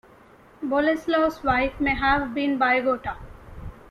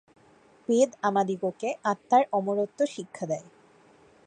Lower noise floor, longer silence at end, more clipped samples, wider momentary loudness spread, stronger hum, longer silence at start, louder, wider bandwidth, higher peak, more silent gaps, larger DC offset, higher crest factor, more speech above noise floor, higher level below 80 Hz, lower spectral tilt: second, -51 dBFS vs -58 dBFS; second, 0.1 s vs 0.85 s; neither; first, 19 LU vs 10 LU; neither; about the same, 0.6 s vs 0.7 s; first, -23 LUFS vs -27 LUFS; first, 13.5 kHz vs 9.8 kHz; about the same, -8 dBFS vs -10 dBFS; neither; neither; about the same, 16 dB vs 18 dB; about the same, 29 dB vs 32 dB; first, -42 dBFS vs -78 dBFS; about the same, -6 dB/octave vs -5.5 dB/octave